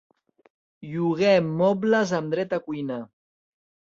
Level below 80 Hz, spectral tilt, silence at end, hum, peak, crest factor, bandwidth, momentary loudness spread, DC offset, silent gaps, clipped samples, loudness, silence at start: -68 dBFS; -6.5 dB/octave; 0.9 s; none; -6 dBFS; 20 dB; 7.6 kHz; 14 LU; under 0.1%; none; under 0.1%; -24 LUFS; 0.8 s